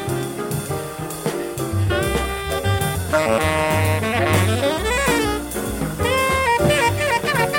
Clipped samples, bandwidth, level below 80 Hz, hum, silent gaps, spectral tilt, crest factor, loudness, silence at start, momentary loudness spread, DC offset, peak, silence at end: under 0.1%; 17 kHz; -34 dBFS; none; none; -4.5 dB/octave; 16 dB; -20 LUFS; 0 s; 8 LU; under 0.1%; -4 dBFS; 0 s